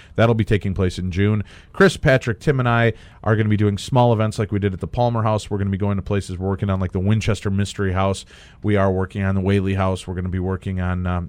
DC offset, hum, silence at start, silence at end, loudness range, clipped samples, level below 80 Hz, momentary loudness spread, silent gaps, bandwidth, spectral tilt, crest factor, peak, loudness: under 0.1%; none; 0.15 s; 0 s; 3 LU; under 0.1%; -40 dBFS; 7 LU; none; 10.5 kHz; -7 dB/octave; 16 dB; -4 dBFS; -20 LUFS